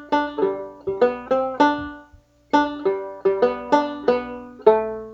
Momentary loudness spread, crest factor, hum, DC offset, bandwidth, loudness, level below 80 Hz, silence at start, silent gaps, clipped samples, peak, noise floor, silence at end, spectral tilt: 9 LU; 20 dB; 60 Hz at -55 dBFS; under 0.1%; 7.8 kHz; -21 LUFS; -54 dBFS; 0 s; none; under 0.1%; 0 dBFS; -52 dBFS; 0 s; -5.5 dB/octave